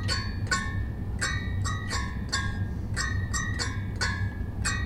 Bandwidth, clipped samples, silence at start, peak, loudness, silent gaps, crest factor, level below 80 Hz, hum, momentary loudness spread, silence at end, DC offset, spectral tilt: 14 kHz; under 0.1%; 0 s; -14 dBFS; -30 LUFS; none; 16 dB; -36 dBFS; none; 4 LU; 0 s; under 0.1%; -3.5 dB/octave